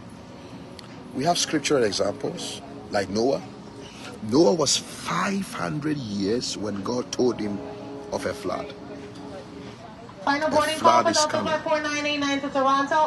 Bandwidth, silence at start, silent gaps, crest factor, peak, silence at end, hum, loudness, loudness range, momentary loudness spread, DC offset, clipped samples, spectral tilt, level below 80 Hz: 12 kHz; 0 s; none; 20 dB; -6 dBFS; 0 s; none; -24 LUFS; 7 LU; 21 LU; under 0.1%; under 0.1%; -3.5 dB/octave; -58 dBFS